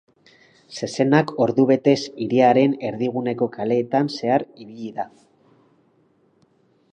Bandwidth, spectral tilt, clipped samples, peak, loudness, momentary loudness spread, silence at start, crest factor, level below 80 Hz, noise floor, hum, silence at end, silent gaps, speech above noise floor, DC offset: 9.2 kHz; -6.5 dB/octave; under 0.1%; -2 dBFS; -20 LUFS; 16 LU; 0.7 s; 20 dB; -68 dBFS; -61 dBFS; none; 1.85 s; none; 41 dB; under 0.1%